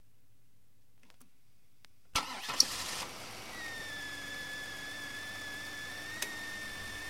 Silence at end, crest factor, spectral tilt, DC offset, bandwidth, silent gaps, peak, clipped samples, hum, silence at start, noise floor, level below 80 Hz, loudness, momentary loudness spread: 0 s; 36 dB; -0.5 dB/octave; 0.2%; 16 kHz; none; -4 dBFS; under 0.1%; none; 1.2 s; -71 dBFS; -62 dBFS; -37 LUFS; 13 LU